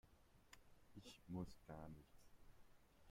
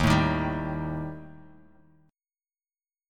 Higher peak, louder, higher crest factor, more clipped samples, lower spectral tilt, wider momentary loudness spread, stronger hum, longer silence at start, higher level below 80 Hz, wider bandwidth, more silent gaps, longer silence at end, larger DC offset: second, -40 dBFS vs -8 dBFS; second, -58 LUFS vs -28 LUFS; about the same, 20 dB vs 22 dB; neither; about the same, -6 dB/octave vs -6.5 dB/octave; second, 15 LU vs 20 LU; neither; about the same, 0.05 s vs 0 s; second, -72 dBFS vs -42 dBFS; first, 16 kHz vs 14.5 kHz; neither; second, 0 s vs 1.7 s; neither